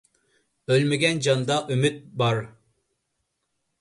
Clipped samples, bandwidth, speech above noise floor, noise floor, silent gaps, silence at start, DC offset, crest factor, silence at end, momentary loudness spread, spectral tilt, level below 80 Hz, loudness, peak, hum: under 0.1%; 11.5 kHz; 54 dB; -77 dBFS; none; 0.7 s; under 0.1%; 18 dB; 1.3 s; 8 LU; -5 dB/octave; -62 dBFS; -23 LUFS; -8 dBFS; none